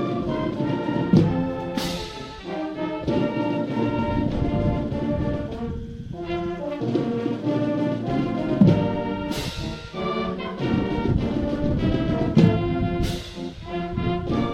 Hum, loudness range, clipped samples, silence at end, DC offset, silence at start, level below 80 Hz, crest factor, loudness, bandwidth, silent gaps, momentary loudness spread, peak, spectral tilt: none; 3 LU; under 0.1%; 0 s; under 0.1%; 0 s; -38 dBFS; 18 dB; -24 LUFS; 15.5 kHz; none; 12 LU; -4 dBFS; -7.5 dB/octave